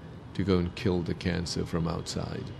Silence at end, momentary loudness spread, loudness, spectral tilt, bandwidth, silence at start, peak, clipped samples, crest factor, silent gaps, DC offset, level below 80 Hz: 0 s; 7 LU; -31 LUFS; -6 dB/octave; 12.5 kHz; 0 s; -12 dBFS; under 0.1%; 20 dB; none; under 0.1%; -48 dBFS